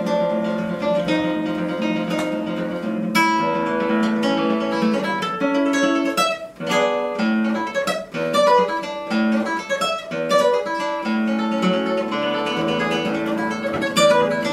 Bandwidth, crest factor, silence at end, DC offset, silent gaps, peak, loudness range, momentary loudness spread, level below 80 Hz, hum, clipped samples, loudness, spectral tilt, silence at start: 16 kHz; 18 dB; 0 s; under 0.1%; none; -2 dBFS; 2 LU; 6 LU; -58 dBFS; none; under 0.1%; -20 LUFS; -5 dB/octave; 0 s